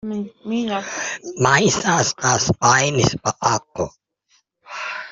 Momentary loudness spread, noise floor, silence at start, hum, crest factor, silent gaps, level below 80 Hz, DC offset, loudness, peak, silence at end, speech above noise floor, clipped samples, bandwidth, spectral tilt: 13 LU; -63 dBFS; 0.05 s; none; 20 dB; none; -48 dBFS; under 0.1%; -19 LUFS; 0 dBFS; 0 s; 44 dB; under 0.1%; 8 kHz; -3.5 dB/octave